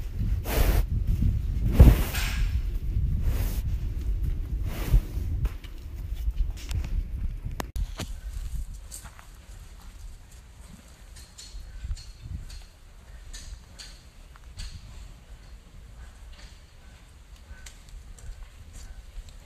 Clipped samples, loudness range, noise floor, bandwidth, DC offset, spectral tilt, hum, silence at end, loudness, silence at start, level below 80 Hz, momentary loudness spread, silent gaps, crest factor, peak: under 0.1%; 22 LU; -49 dBFS; 15.5 kHz; under 0.1%; -6 dB/octave; none; 0.05 s; -29 LUFS; 0 s; -30 dBFS; 22 LU; none; 26 dB; -4 dBFS